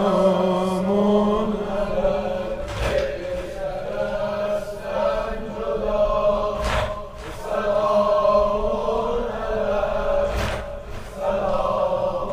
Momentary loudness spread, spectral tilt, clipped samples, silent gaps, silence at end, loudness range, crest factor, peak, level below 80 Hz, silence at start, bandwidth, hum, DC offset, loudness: 10 LU; -6.5 dB/octave; under 0.1%; none; 0 s; 4 LU; 16 dB; -6 dBFS; -34 dBFS; 0 s; 15 kHz; none; under 0.1%; -23 LUFS